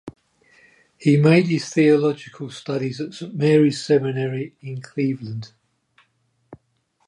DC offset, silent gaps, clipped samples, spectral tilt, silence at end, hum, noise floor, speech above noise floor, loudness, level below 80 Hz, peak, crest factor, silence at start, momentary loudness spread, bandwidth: under 0.1%; none; under 0.1%; -7 dB/octave; 0.5 s; none; -67 dBFS; 48 dB; -20 LUFS; -66 dBFS; -4 dBFS; 18 dB; 0.05 s; 17 LU; 11 kHz